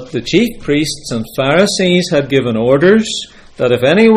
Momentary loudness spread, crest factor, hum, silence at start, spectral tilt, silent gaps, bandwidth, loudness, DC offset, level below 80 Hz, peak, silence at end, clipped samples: 10 LU; 12 dB; none; 0 s; -5 dB/octave; none; 16 kHz; -13 LUFS; under 0.1%; -42 dBFS; 0 dBFS; 0 s; under 0.1%